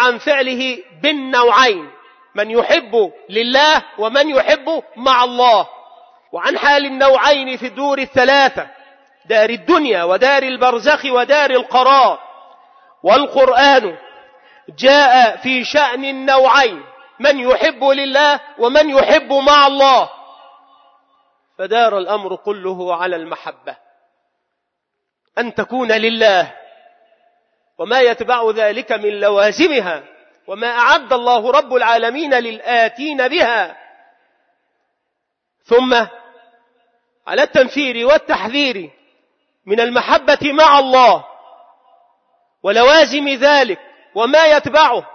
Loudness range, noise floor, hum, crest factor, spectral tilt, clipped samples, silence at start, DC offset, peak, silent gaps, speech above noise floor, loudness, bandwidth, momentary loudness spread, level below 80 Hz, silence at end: 7 LU; -76 dBFS; none; 14 dB; -2.5 dB/octave; under 0.1%; 0 s; under 0.1%; 0 dBFS; none; 62 dB; -13 LUFS; 6.6 kHz; 13 LU; -54 dBFS; 0.05 s